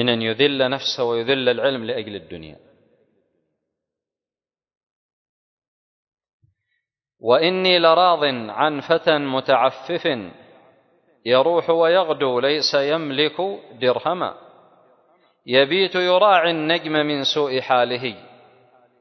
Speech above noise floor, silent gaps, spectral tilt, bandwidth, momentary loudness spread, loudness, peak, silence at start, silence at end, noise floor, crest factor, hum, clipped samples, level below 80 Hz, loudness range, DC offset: over 71 dB; 4.77-5.57 s, 5.68-6.07 s, 6.33-6.40 s; -5 dB/octave; 6.4 kHz; 12 LU; -19 LUFS; -2 dBFS; 0 s; 0.8 s; under -90 dBFS; 18 dB; none; under 0.1%; -66 dBFS; 7 LU; under 0.1%